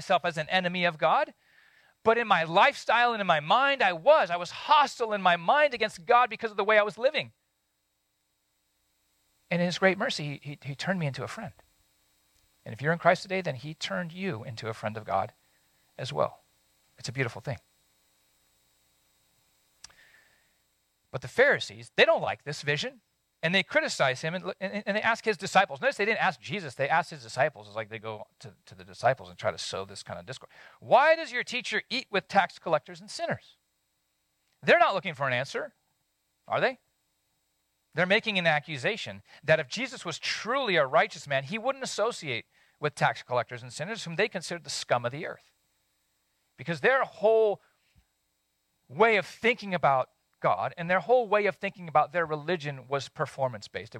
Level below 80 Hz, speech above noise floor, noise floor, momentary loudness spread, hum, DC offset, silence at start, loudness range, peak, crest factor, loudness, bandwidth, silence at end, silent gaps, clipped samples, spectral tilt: -72 dBFS; 49 dB; -77 dBFS; 14 LU; none; under 0.1%; 0 s; 9 LU; -6 dBFS; 22 dB; -27 LUFS; 16.5 kHz; 0 s; none; under 0.1%; -4 dB/octave